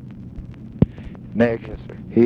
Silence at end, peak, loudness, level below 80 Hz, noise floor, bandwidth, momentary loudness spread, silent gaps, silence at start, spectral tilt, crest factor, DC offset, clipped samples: 0 s; 0 dBFS; -22 LUFS; -38 dBFS; -36 dBFS; 5.4 kHz; 17 LU; none; 0 s; -10 dB/octave; 22 dB; under 0.1%; under 0.1%